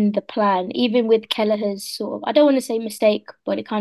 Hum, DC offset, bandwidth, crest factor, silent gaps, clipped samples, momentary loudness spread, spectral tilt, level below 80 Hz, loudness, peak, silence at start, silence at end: none; under 0.1%; 12.5 kHz; 16 dB; none; under 0.1%; 10 LU; -5 dB/octave; -72 dBFS; -20 LUFS; -2 dBFS; 0 s; 0 s